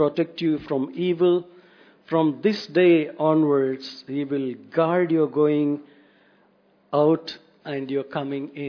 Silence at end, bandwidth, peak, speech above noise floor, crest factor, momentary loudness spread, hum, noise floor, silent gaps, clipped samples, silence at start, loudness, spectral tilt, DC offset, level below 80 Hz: 0 s; 5.4 kHz; -6 dBFS; 38 dB; 16 dB; 11 LU; none; -60 dBFS; none; under 0.1%; 0 s; -23 LUFS; -8 dB/octave; under 0.1%; -70 dBFS